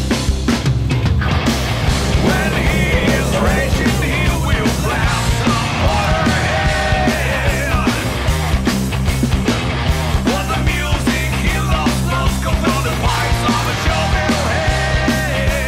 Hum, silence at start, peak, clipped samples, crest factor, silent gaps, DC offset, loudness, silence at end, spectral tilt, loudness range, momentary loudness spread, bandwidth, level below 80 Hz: none; 0 s; -4 dBFS; under 0.1%; 10 dB; none; under 0.1%; -16 LUFS; 0 s; -5 dB/octave; 1 LU; 2 LU; 16 kHz; -22 dBFS